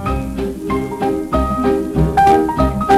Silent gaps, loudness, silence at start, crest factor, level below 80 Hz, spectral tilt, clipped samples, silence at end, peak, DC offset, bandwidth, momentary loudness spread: none; -16 LUFS; 0 s; 16 dB; -26 dBFS; -7 dB/octave; under 0.1%; 0 s; 0 dBFS; under 0.1%; 15 kHz; 9 LU